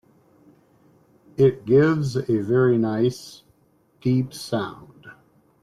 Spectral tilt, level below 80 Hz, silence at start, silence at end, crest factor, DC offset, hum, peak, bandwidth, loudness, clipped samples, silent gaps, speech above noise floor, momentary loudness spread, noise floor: -7.5 dB/octave; -62 dBFS; 1.4 s; 0.5 s; 16 dB; under 0.1%; none; -6 dBFS; 13.5 kHz; -22 LUFS; under 0.1%; none; 41 dB; 18 LU; -62 dBFS